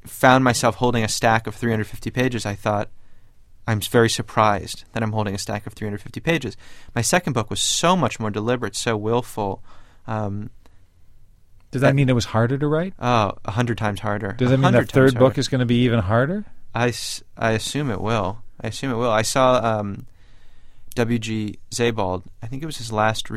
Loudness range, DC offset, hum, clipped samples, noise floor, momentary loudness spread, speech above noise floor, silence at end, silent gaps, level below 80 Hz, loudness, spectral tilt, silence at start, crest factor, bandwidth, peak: 6 LU; under 0.1%; none; under 0.1%; -47 dBFS; 13 LU; 27 dB; 0 s; none; -44 dBFS; -21 LUFS; -5 dB/octave; 0.05 s; 20 dB; 15.5 kHz; -2 dBFS